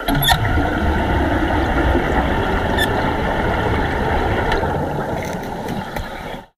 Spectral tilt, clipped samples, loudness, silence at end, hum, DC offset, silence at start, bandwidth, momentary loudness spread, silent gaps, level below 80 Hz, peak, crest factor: -5.5 dB/octave; under 0.1%; -19 LUFS; 0.1 s; none; under 0.1%; 0 s; 15.5 kHz; 9 LU; none; -24 dBFS; 0 dBFS; 18 dB